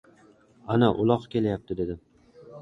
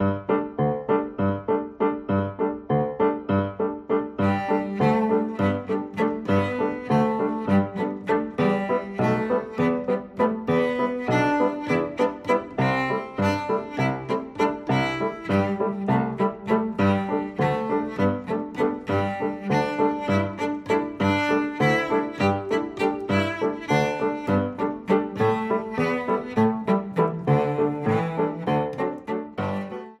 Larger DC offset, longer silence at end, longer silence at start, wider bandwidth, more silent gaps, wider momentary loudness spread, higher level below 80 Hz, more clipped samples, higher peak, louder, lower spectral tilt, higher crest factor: neither; about the same, 0 s vs 0.05 s; first, 0.65 s vs 0 s; second, 7.4 kHz vs 11.5 kHz; neither; first, 15 LU vs 5 LU; about the same, -52 dBFS vs -56 dBFS; neither; about the same, -6 dBFS vs -8 dBFS; about the same, -26 LUFS vs -24 LUFS; first, -9 dB/octave vs -7.5 dB/octave; about the same, 20 dB vs 16 dB